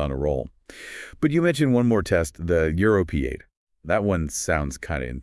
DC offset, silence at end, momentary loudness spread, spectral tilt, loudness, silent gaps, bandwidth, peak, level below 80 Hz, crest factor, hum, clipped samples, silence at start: under 0.1%; 0 s; 17 LU; -6 dB/octave; -23 LUFS; 3.57-3.67 s; 12 kHz; -6 dBFS; -38 dBFS; 16 dB; none; under 0.1%; 0 s